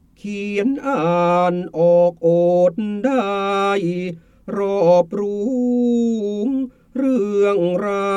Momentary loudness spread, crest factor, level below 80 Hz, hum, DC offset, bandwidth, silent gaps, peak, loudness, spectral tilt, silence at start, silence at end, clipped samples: 9 LU; 14 dB; -56 dBFS; none; under 0.1%; 9.2 kHz; none; -4 dBFS; -18 LUFS; -7.5 dB/octave; 0.25 s; 0 s; under 0.1%